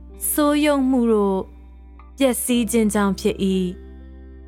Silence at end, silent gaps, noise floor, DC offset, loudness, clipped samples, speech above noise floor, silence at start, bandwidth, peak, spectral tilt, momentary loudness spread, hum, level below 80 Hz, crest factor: 0 s; none; -42 dBFS; under 0.1%; -20 LUFS; under 0.1%; 23 dB; 0 s; 17 kHz; -6 dBFS; -5 dB/octave; 8 LU; none; -40 dBFS; 14 dB